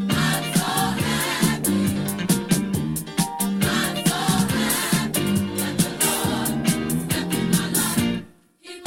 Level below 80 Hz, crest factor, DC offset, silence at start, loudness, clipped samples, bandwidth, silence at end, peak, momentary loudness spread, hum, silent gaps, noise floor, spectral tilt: -48 dBFS; 18 dB; under 0.1%; 0 s; -22 LUFS; under 0.1%; 17 kHz; 0 s; -4 dBFS; 4 LU; none; none; -44 dBFS; -4 dB/octave